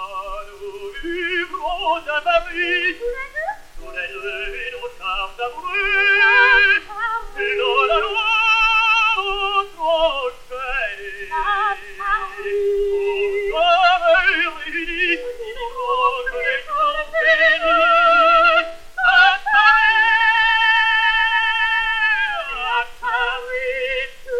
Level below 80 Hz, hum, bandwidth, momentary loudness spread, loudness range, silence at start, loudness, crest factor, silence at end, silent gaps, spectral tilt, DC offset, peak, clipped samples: -40 dBFS; none; 15 kHz; 15 LU; 9 LU; 0 s; -17 LUFS; 18 dB; 0 s; none; -2 dB/octave; under 0.1%; 0 dBFS; under 0.1%